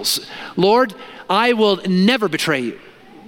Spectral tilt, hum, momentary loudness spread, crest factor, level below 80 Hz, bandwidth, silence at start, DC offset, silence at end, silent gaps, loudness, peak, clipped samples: -4.5 dB/octave; none; 10 LU; 18 dB; -62 dBFS; 17.5 kHz; 0 s; under 0.1%; 0.45 s; none; -17 LUFS; 0 dBFS; under 0.1%